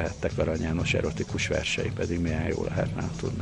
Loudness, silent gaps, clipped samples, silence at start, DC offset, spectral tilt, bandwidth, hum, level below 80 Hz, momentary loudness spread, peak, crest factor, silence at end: -28 LUFS; none; under 0.1%; 0 s; under 0.1%; -5.5 dB/octave; 11 kHz; none; -40 dBFS; 4 LU; -12 dBFS; 16 dB; 0 s